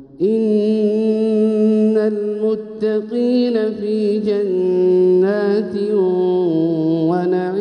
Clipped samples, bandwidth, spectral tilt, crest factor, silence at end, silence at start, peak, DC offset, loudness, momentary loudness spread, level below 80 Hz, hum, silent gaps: under 0.1%; 9.4 kHz; -9 dB/octave; 10 dB; 0 s; 0 s; -6 dBFS; under 0.1%; -17 LUFS; 5 LU; -64 dBFS; none; none